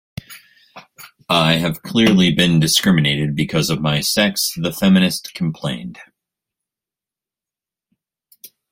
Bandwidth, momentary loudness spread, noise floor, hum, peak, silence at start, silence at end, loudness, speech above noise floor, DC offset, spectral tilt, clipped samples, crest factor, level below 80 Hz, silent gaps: 16.5 kHz; 12 LU; -89 dBFS; none; -2 dBFS; 0.3 s; 0.25 s; -16 LUFS; 73 dB; under 0.1%; -4.5 dB/octave; under 0.1%; 18 dB; -50 dBFS; none